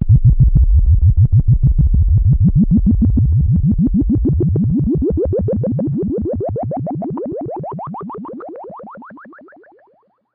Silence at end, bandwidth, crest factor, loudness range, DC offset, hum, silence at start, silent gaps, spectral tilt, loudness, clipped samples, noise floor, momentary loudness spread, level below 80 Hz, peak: 1.05 s; 1.9 kHz; 12 dB; 13 LU; under 0.1%; none; 0 s; none; -15.5 dB/octave; -15 LUFS; under 0.1%; -56 dBFS; 16 LU; -18 dBFS; -2 dBFS